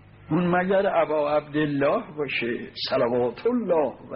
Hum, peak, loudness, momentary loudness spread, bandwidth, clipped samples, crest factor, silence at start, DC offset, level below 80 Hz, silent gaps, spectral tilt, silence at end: none; -10 dBFS; -24 LUFS; 6 LU; 5.6 kHz; under 0.1%; 14 dB; 0.2 s; under 0.1%; -58 dBFS; none; -4.5 dB/octave; 0 s